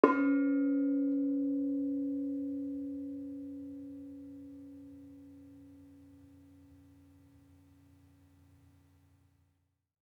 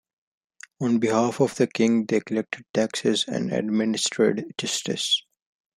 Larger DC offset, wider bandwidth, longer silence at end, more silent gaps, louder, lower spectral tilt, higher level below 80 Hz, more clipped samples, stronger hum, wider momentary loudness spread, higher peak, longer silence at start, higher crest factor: neither; second, 3.5 kHz vs 13.5 kHz; first, 3.85 s vs 0.55 s; second, none vs 2.70-2.74 s; second, -34 LUFS vs -24 LUFS; first, -8.5 dB/octave vs -4 dB/octave; second, -78 dBFS vs -70 dBFS; neither; neither; first, 25 LU vs 6 LU; about the same, -8 dBFS vs -6 dBFS; second, 0.05 s vs 0.8 s; first, 30 dB vs 18 dB